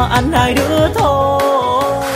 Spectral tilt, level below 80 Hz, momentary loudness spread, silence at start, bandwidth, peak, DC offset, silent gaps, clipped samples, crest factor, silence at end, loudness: -5.5 dB/octave; -28 dBFS; 1 LU; 0 s; 16 kHz; 0 dBFS; under 0.1%; none; under 0.1%; 12 dB; 0 s; -13 LUFS